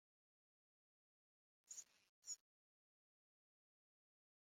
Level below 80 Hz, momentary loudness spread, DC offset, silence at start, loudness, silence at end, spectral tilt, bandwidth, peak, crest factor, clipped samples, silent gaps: under -90 dBFS; 8 LU; under 0.1%; 1.65 s; -56 LUFS; 2.2 s; 3.5 dB/octave; 15.5 kHz; -40 dBFS; 26 dB; under 0.1%; 2.09-2.22 s